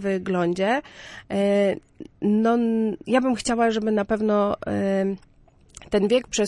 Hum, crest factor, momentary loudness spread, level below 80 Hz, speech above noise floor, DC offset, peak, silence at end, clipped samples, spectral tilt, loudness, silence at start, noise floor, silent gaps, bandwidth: none; 16 dB; 8 LU; -52 dBFS; 27 dB; under 0.1%; -8 dBFS; 0 s; under 0.1%; -5.5 dB/octave; -23 LUFS; 0 s; -50 dBFS; none; 11.5 kHz